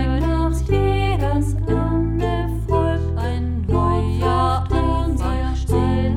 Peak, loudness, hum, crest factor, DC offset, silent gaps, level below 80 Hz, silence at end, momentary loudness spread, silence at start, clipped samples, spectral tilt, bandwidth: -6 dBFS; -20 LUFS; none; 14 dB; under 0.1%; none; -24 dBFS; 0 s; 4 LU; 0 s; under 0.1%; -8 dB/octave; 12.5 kHz